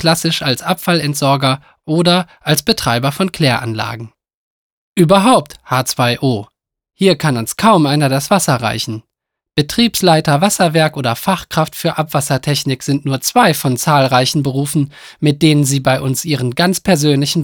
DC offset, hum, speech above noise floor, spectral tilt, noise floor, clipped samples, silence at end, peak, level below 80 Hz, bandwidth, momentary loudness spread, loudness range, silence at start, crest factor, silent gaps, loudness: under 0.1%; none; 65 dB; -4.5 dB/octave; -79 dBFS; under 0.1%; 0 s; 0 dBFS; -48 dBFS; over 20 kHz; 7 LU; 2 LU; 0 s; 14 dB; 4.34-4.96 s; -14 LUFS